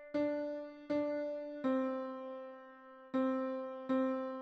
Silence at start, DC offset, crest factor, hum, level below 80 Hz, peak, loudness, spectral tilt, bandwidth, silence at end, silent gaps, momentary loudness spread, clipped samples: 0 s; under 0.1%; 14 dB; none; -80 dBFS; -24 dBFS; -38 LUFS; -7 dB/octave; 6.2 kHz; 0 s; none; 13 LU; under 0.1%